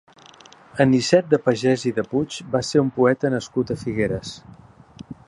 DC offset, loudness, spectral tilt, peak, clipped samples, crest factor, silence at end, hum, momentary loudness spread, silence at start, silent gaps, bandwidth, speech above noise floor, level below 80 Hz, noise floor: under 0.1%; -21 LUFS; -6 dB/octave; -2 dBFS; under 0.1%; 20 dB; 0.15 s; none; 12 LU; 0.75 s; none; 11 kHz; 27 dB; -52 dBFS; -48 dBFS